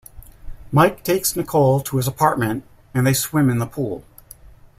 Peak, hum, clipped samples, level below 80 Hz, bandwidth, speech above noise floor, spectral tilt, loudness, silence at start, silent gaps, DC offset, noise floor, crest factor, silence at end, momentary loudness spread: -2 dBFS; none; under 0.1%; -44 dBFS; 16 kHz; 26 dB; -5.5 dB/octave; -19 LUFS; 0.15 s; none; under 0.1%; -44 dBFS; 18 dB; 0.8 s; 10 LU